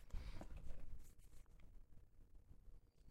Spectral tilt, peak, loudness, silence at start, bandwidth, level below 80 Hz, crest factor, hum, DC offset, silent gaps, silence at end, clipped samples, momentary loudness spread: -6 dB/octave; -34 dBFS; -62 LUFS; 0 s; 12.5 kHz; -56 dBFS; 16 dB; none; under 0.1%; none; 0 s; under 0.1%; 13 LU